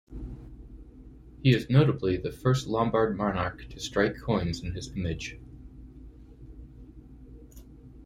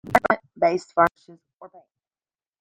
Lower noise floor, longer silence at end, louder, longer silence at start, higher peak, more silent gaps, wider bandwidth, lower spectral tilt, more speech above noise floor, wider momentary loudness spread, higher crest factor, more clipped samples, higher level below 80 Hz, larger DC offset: second, -49 dBFS vs under -90 dBFS; second, 0 s vs 0.95 s; second, -28 LUFS vs -22 LUFS; about the same, 0.1 s vs 0.05 s; second, -8 dBFS vs -2 dBFS; second, none vs 1.53-1.58 s; second, 13.5 kHz vs 16.5 kHz; about the same, -6.5 dB/octave vs -5.5 dB/octave; second, 22 dB vs over 65 dB; first, 26 LU vs 2 LU; about the same, 22 dB vs 22 dB; neither; first, -46 dBFS vs -58 dBFS; neither